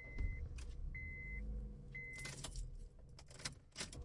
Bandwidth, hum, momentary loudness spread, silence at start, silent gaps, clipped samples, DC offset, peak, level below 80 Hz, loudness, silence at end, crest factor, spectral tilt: 11.5 kHz; none; 10 LU; 0 s; none; under 0.1%; under 0.1%; -28 dBFS; -50 dBFS; -50 LUFS; 0 s; 20 dB; -3.5 dB/octave